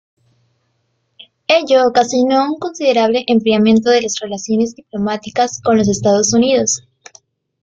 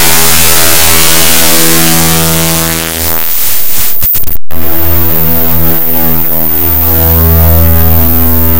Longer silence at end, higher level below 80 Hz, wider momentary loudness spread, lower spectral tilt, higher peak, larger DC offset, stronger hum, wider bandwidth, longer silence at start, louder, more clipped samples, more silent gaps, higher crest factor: first, 0.85 s vs 0 s; second, -54 dBFS vs -18 dBFS; first, 9 LU vs 5 LU; about the same, -4 dB/octave vs -3 dB/octave; about the same, -2 dBFS vs 0 dBFS; second, under 0.1% vs 40%; neither; second, 8.8 kHz vs over 20 kHz; first, 1.5 s vs 0 s; second, -14 LUFS vs -6 LUFS; second, under 0.1% vs 10%; neither; first, 14 dB vs 8 dB